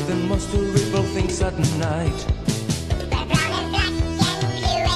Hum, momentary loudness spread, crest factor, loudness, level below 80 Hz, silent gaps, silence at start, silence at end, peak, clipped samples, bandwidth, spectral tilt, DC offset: none; 4 LU; 16 dB; -22 LUFS; -30 dBFS; none; 0 s; 0 s; -4 dBFS; under 0.1%; 13 kHz; -5 dB/octave; under 0.1%